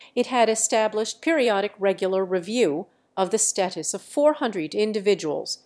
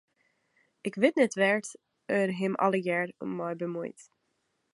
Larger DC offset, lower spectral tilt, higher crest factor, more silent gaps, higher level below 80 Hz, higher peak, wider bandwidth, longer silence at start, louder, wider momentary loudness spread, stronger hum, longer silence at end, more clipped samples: neither; second, -3 dB/octave vs -5.5 dB/octave; second, 16 dB vs 22 dB; neither; about the same, -80 dBFS vs -80 dBFS; about the same, -6 dBFS vs -8 dBFS; about the same, 11 kHz vs 11.5 kHz; second, 0 s vs 0.85 s; first, -23 LUFS vs -29 LUFS; second, 6 LU vs 14 LU; neither; second, 0.1 s vs 0.7 s; neither